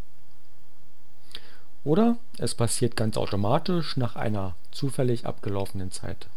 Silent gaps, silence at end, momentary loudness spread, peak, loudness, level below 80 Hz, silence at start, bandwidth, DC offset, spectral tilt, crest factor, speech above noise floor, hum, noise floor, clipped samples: none; 0.1 s; 13 LU; -8 dBFS; -28 LUFS; -54 dBFS; 1.35 s; 18.5 kHz; 5%; -5.5 dB/octave; 18 dB; 33 dB; none; -60 dBFS; under 0.1%